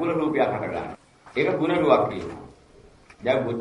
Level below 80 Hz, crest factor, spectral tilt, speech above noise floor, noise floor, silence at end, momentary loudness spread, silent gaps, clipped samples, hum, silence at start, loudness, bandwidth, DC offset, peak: -56 dBFS; 22 dB; -7.5 dB/octave; 29 dB; -52 dBFS; 0 s; 18 LU; none; under 0.1%; none; 0 s; -24 LUFS; 11 kHz; under 0.1%; -4 dBFS